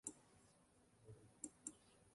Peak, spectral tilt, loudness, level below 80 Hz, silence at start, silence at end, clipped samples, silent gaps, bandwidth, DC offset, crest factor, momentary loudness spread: -32 dBFS; -3.5 dB/octave; -57 LUFS; -82 dBFS; 0.05 s; 0 s; under 0.1%; none; 11.5 kHz; under 0.1%; 28 dB; 15 LU